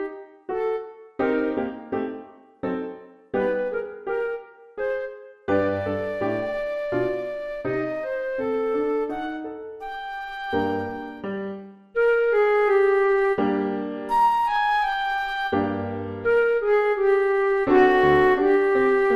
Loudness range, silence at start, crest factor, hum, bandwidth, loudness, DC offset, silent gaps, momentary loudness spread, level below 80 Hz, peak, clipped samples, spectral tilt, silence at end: 8 LU; 0 s; 16 dB; none; 12 kHz; -23 LUFS; under 0.1%; none; 14 LU; -52 dBFS; -6 dBFS; under 0.1%; -7 dB/octave; 0 s